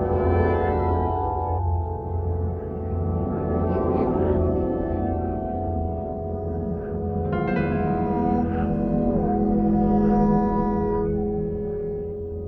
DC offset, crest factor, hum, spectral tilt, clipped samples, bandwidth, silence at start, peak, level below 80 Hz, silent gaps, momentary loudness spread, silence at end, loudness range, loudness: under 0.1%; 14 dB; none; -11.5 dB/octave; under 0.1%; 4.3 kHz; 0 s; -8 dBFS; -34 dBFS; none; 8 LU; 0 s; 4 LU; -24 LUFS